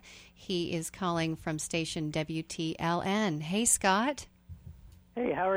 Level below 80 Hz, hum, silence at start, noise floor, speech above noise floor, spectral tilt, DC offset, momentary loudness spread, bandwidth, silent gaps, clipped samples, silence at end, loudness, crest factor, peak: -58 dBFS; none; 0.05 s; -51 dBFS; 20 dB; -3.5 dB/octave; under 0.1%; 23 LU; over 20 kHz; none; under 0.1%; 0 s; -31 LUFS; 22 dB; -10 dBFS